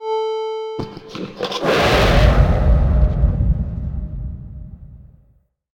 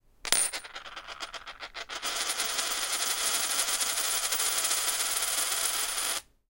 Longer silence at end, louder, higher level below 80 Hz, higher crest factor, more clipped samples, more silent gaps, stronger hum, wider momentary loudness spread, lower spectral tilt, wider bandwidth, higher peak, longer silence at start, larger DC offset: first, 0.75 s vs 0.3 s; first, -18 LUFS vs -27 LUFS; first, -20 dBFS vs -60 dBFS; second, 16 dB vs 30 dB; neither; neither; neither; first, 17 LU vs 14 LU; first, -6.5 dB/octave vs 2.5 dB/octave; about the same, 16 kHz vs 17 kHz; about the same, 0 dBFS vs 0 dBFS; second, 0 s vs 0.25 s; neither